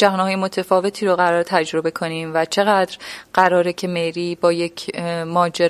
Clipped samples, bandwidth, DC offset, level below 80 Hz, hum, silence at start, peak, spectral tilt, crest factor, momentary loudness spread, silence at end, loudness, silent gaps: under 0.1%; 15 kHz; under 0.1%; -62 dBFS; none; 0 s; 0 dBFS; -5 dB/octave; 18 dB; 8 LU; 0 s; -19 LUFS; none